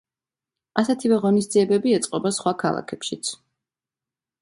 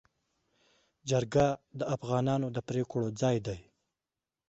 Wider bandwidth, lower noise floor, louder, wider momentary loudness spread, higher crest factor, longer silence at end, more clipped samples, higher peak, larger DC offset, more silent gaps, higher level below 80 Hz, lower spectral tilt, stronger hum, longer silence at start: first, 11.5 kHz vs 8.2 kHz; about the same, under -90 dBFS vs under -90 dBFS; first, -22 LUFS vs -32 LUFS; about the same, 10 LU vs 10 LU; about the same, 22 dB vs 20 dB; first, 1.05 s vs 0.85 s; neither; first, 0 dBFS vs -12 dBFS; neither; neither; second, -68 dBFS vs -60 dBFS; second, -5 dB/octave vs -6.5 dB/octave; neither; second, 0.75 s vs 1.05 s